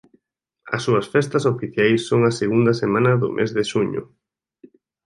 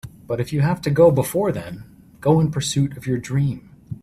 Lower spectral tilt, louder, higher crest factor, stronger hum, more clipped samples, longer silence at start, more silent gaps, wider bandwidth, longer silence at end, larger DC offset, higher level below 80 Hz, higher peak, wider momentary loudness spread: about the same, -6.5 dB/octave vs -6.5 dB/octave; about the same, -20 LUFS vs -20 LUFS; about the same, 18 dB vs 18 dB; neither; neither; first, 0.65 s vs 0.05 s; neither; second, 11.5 kHz vs 14.5 kHz; first, 1 s vs 0.1 s; neither; second, -58 dBFS vs -50 dBFS; about the same, -4 dBFS vs -2 dBFS; second, 6 LU vs 17 LU